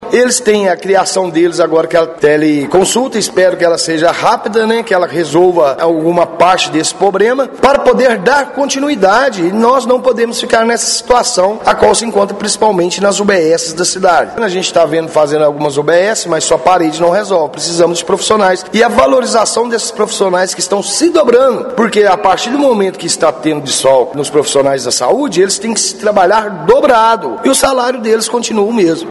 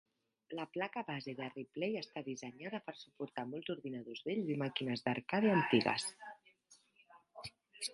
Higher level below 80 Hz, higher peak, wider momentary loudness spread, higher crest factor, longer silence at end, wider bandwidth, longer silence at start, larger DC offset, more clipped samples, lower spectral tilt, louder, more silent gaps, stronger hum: first, -44 dBFS vs -80 dBFS; first, 0 dBFS vs -16 dBFS; second, 4 LU vs 19 LU; second, 10 dB vs 24 dB; about the same, 0 s vs 0 s; about the same, 12 kHz vs 11.5 kHz; second, 0 s vs 0.5 s; neither; first, 0.5% vs under 0.1%; second, -3 dB/octave vs -5 dB/octave; first, -10 LUFS vs -39 LUFS; neither; neither